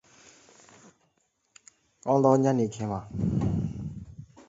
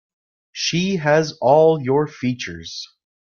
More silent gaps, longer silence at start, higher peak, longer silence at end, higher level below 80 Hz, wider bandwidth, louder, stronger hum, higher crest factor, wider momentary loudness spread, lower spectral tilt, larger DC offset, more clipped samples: neither; first, 2.05 s vs 0.55 s; second, -8 dBFS vs -2 dBFS; about the same, 0.25 s vs 0.35 s; first, -50 dBFS vs -58 dBFS; first, 8 kHz vs 7.2 kHz; second, -27 LUFS vs -18 LUFS; neither; about the same, 22 dB vs 18 dB; about the same, 18 LU vs 18 LU; first, -8 dB/octave vs -5 dB/octave; neither; neither